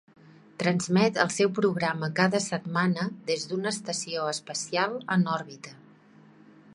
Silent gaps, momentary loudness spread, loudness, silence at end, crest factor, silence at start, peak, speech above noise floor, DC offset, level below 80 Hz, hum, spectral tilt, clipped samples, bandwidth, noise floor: none; 7 LU; -27 LUFS; 1 s; 24 dB; 0.6 s; -6 dBFS; 28 dB; under 0.1%; -72 dBFS; none; -4.5 dB/octave; under 0.1%; 11.5 kHz; -55 dBFS